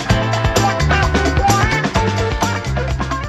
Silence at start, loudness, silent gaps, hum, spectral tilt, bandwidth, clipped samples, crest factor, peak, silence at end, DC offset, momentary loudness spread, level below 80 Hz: 0 s; -16 LUFS; none; none; -5 dB/octave; 15 kHz; under 0.1%; 14 dB; -2 dBFS; 0 s; under 0.1%; 6 LU; -24 dBFS